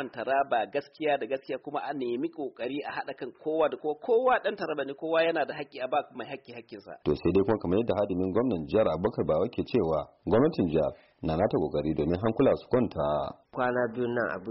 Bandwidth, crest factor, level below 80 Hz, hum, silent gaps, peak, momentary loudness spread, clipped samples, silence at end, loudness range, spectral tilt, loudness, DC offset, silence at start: 5.8 kHz; 14 dB; -54 dBFS; none; none; -14 dBFS; 10 LU; under 0.1%; 0 s; 4 LU; -5.5 dB/octave; -29 LUFS; under 0.1%; 0 s